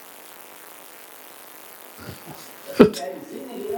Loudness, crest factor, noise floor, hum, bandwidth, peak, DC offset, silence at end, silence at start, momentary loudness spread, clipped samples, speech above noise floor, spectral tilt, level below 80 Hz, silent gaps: -21 LUFS; 26 dB; -43 dBFS; none; 19 kHz; 0 dBFS; under 0.1%; 0 s; 0 s; 24 LU; under 0.1%; 21 dB; -6 dB/octave; -56 dBFS; none